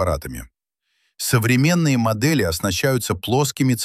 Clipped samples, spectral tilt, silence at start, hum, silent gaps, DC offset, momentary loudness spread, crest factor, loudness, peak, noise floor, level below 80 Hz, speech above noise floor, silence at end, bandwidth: under 0.1%; -5 dB/octave; 0 s; none; none; under 0.1%; 10 LU; 16 dB; -19 LUFS; -4 dBFS; -71 dBFS; -42 dBFS; 52 dB; 0 s; 16 kHz